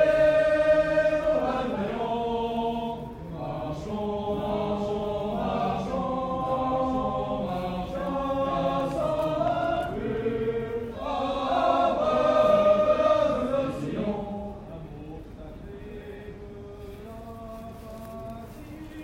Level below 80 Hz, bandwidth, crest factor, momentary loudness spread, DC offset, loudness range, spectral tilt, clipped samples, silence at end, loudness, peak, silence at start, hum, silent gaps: -46 dBFS; 12 kHz; 16 dB; 20 LU; under 0.1%; 17 LU; -7 dB/octave; under 0.1%; 0 s; -26 LUFS; -10 dBFS; 0 s; none; none